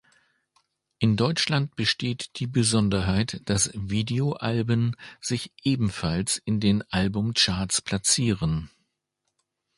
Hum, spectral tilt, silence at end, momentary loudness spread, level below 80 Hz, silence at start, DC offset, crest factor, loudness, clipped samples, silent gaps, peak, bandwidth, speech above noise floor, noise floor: none; -4 dB/octave; 1.1 s; 7 LU; -46 dBFS; 1 s; under 0.1%; 18 dB; -25 LUFS; under 0.1%; none; -6 dBFS; 11.5 kHz; 55 dB; -80 dBFS